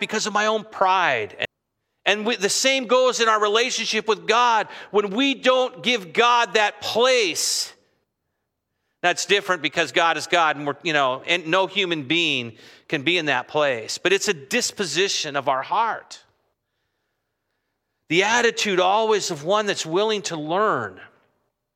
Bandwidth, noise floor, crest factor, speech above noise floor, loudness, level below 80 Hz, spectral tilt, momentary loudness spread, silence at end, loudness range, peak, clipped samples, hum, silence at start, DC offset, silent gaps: 16 kHz; -78 dBFS; 20 dB; 56 dB; -21 LUFS; -76 dBFS; -2 dB/octave; 6 LU; 0.7 s; 4 LU; -2 dBFS; under 0.1%; none; 0 s; under 0.1%; none